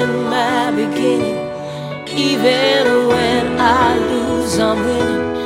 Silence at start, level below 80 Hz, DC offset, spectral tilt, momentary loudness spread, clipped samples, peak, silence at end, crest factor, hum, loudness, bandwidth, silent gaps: 0 s; -42 dBFS; under 0.1%; -4.5 dB/octave; 10 LU; under 0.1%; -2 dBFS; 0 s; 14 dB; none; -15 LUFS; 16 kHz; none